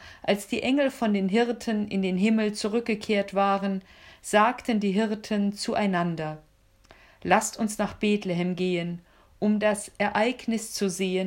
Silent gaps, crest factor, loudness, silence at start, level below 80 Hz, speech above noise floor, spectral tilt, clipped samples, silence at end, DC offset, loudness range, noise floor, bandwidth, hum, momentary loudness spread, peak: none; 20 dB; -26 LUFS; 0 s; -60 dBFS; 31 dB; -5 dB/octave; under 0.1%; 0 s; under 0.1%; 2 LU; -57 dBFS; 16 kHz; none; 6 LU; -6 dBFS